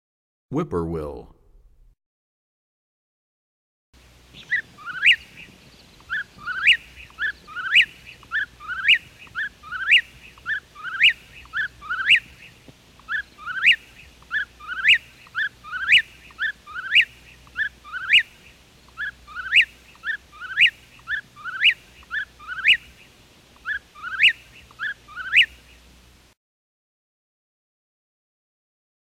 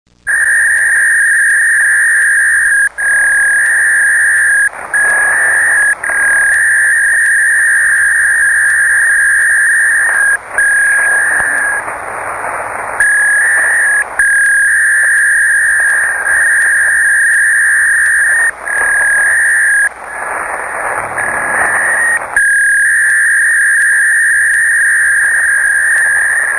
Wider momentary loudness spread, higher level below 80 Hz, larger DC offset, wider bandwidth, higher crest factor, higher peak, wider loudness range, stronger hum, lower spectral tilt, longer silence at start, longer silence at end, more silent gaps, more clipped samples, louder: first, 16 LU vs 6 LU; second, -54 dBFS vs -46 dBFS; neither; first, 16 kHz vs 10.5 kHz; first, 18 dB vs 10 dB; second, -8 dBFS vs 0 dBFS; about the same, 5 LU vs 3 LU; neither; first, -2 dB/octave vs 0 dB/octave; first, 0.5 s vs 0.25 s; first, 3.55 s vs 0 s; first, 2.06-3.93 s vs none; neither; second, -20 LUFS vs -8 LUFS